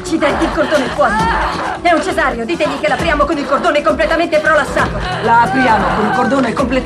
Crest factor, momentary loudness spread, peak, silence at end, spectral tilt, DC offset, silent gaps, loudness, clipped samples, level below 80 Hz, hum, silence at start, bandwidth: 12 dB; 5 LU; -2 dBFS; 0 s; -5 dB/octave; under 0.1%; none; -13 LUFS; under 0.1%; -30 dBFS; none; 0 s; 13 kHz